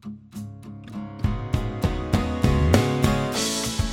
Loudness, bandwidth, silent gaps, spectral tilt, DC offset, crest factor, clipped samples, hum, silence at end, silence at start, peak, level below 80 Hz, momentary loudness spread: -23 LUFS; 17 kHz; none; -5.5 dB/octave; under 0.1%; 22 dB; under 0.1%; none; 0 s; 0.05 s; -2 dBFS; -32 dBFS; 18 LU